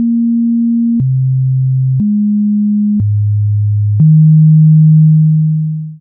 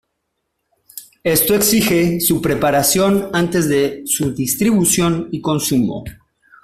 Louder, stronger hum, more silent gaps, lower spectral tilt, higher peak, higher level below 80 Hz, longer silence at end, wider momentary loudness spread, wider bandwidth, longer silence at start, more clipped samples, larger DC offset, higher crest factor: first, -10 LUFS vs -16 LUFS; neither; neither; first, -24.5 dB/octave vs -4 dB/octave; about the same, -2 dBFS vs -2 dBFS; about the same, -46 dBFS vs -46 dBFS; second, 0.05 s vs 0.5 s; second, 7 LU vs 10 LU; second, 0.5 kHz vs 16 kHz; second, 0 s vs 0.95 s; neither; neither; second, 8 dB vs 16 dB